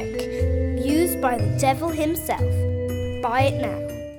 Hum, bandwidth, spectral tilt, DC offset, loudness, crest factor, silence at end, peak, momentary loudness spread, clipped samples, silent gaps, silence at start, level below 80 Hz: none; 19.5 kHz; -6 dB/octave; under 0.1%; -23 LUFS; 16 dB; 0 s; -6 dBFS; 6 LU; under 0.1%; none; 0 s; -38 dBFS